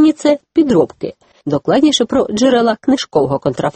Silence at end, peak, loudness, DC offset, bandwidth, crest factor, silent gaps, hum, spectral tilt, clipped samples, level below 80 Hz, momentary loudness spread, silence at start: 0.05 s; 0 dBFS; -14 LUFS; under 0.1%; 8.8 kHz; 14 dB; none; none; -5 dB/octave; under 0.1%; -48 dBFS; 8 LU; 0 s